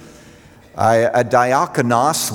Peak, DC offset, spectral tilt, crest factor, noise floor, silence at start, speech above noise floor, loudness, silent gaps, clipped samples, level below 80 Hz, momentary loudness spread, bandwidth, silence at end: -2 dBFS; under 0.1%; -4.5 dB/octave; 16 dB; -44 dBFS; 0 s; 29 dB; -16 LUFS; none; under 0.1%; -54 dBFS; 4 LU; over 20 kHz; 0 s